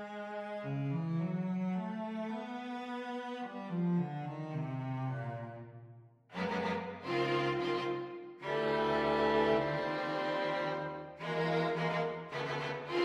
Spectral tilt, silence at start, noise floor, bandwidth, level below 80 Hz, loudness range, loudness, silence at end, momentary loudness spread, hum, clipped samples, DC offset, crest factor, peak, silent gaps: -7 dB/octave; 0 s; -57 dBFS; 10 kHz; -66 dBFS; 6 LU; -36 LUFS; 0 s; 11 LU; none; under 0.1%; under 0.1%; 18 dB; -18 dBFS; none